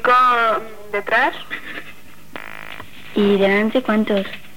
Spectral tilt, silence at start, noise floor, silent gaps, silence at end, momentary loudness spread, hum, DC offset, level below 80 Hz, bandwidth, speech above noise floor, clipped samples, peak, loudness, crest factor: -6 dB/octave; 0.05 s; -43 dBFS; none; 0.2 s; 19 LU; none; 2%; -58 dBFS; 18 kHz; 26 dB; under 0.1%; -4 dBFS; -18 LUFS; 16 dB